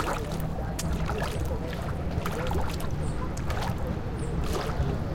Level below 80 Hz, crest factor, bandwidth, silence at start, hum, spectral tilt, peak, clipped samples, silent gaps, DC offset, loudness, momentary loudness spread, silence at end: -34 dBFS; 16 dB; 17 kHz; 0 s; none; -6 dB/octave; -14 dBFS; under 0.1%; none; under 0.1%; -31 LUFS; 3 LU; 0 s